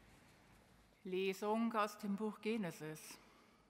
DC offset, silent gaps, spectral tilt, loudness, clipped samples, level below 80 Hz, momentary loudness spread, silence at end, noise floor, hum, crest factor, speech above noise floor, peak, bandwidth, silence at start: under 0.1%; none; -5.5 dB/octave; -42 LUFS; under 0.1%; -78 dBFS; 16 LU; 0.45 s; -68 dBFS; none; 20 dB; 27 dB; -24 dBFS; 16 kHz; 0.05 s